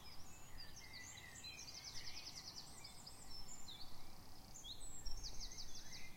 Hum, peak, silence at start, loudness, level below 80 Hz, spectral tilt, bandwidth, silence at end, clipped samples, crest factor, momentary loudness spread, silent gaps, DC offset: none; -32 dBFS; 0 s; -53 LUFS; -58 dBFS; -1.5 dB/octave; 16.5 kHz; 0 s; under 0.1%; 16 dB; 8 LU; none; under 0.1%